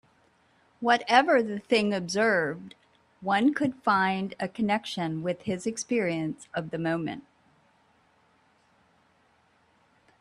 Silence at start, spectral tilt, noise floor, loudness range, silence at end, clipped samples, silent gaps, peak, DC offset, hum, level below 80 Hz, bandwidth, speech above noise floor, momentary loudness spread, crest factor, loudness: 0.8 s; -5 dB/octave; -65 dBFS; 12 LU; 3 s; under 0.1%; none; -6 dBFS; under 0.1%; none; -70 dBFS; 12 kHz; 39 dB; 12 LU; 24 dB; -27 LUFS